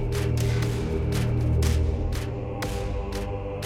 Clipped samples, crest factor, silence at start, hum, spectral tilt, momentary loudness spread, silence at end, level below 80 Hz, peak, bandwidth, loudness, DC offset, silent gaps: under 0.1%; 14 dB; 0 s; none; -6.5 dB/octave; 8 LU; 0 s; -30 dBFS; -10 dBFS; 16 kHz; -27 LUFS; under 0.1%; none